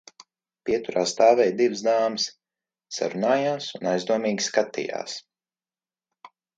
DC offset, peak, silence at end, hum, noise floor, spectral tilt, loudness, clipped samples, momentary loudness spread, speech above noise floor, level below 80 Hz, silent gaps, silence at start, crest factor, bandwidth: under 0.1%; -4 dBFS; 0.3 s; none; under -90 dBFS; -3.5 dB/octave; -24 LUFS; under 0.1%; 13 LU; over 67 dB; -70 dBFS; none; 0.65 s; 20 dB; 9.4 kHz